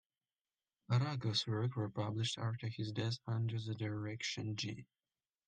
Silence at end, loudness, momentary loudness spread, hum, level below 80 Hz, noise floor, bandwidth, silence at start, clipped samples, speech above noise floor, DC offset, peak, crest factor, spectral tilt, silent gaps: 0.65 s; -39 LUFS; 6 LU; none; -76 dBFS; under -90 dBFS; 9.4 kHz; 0.9 s; under 0.1%; over 51 dB; under 0.1%; -24 dBFS; 16 dB; -5.5 dB/octave; none